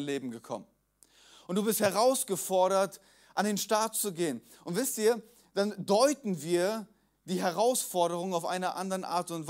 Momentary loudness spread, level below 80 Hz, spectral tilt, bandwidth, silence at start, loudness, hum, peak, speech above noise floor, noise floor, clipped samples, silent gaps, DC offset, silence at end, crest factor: 11 LU; -78 dBFS; -4 dB/octave; 16 kHz; 0 s; -30 LUFS; none; -12 dBFS; 34 dB; -64 dBFS; under 0.1%; none; under 0.1%; 0 s; 20 dB